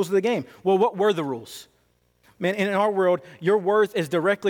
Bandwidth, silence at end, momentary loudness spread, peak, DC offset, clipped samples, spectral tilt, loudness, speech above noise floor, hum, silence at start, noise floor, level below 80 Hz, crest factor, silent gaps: 17.5 kHz; 0 s; 9 LU; -10 dBFS; under 0.1%; under 0.1%; -6 dB/octave; -23 LUFS; 43 dB; 60 Hz at -50 dBFS; 0 s; -65 dBFS; -70 dBFS; 14 dB; none